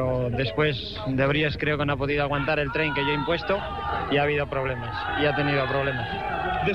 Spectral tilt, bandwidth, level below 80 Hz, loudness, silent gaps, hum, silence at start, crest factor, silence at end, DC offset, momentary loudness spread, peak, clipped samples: -7.5 dB/octave; 6.8 kHz; -42 dBFS; -25 LUFS; none; none; 0 s; 16 dB; 0 s; 0.3%; 6 LU; -10 dBFS; under 0.1%